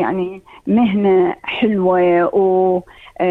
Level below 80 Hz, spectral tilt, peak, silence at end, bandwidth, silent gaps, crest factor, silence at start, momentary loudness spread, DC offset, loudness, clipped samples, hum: -52 dBFS; -9 dB/octave; -4 dBFS; 0 s; 4 kHz; none; 10 dB; 0 s; 9 LU; under 0.1%; -16 LUFS; under 0.1%; none